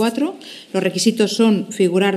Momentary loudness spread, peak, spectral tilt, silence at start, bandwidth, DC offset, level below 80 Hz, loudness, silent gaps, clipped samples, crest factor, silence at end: 9 LU; -2 dBFS; -4.5 dB/octave; 0 s; 14 kHz; under 0.1%; -78 dBFS; -18 LUFS; none; under 0.1%; 14 dB; 0 s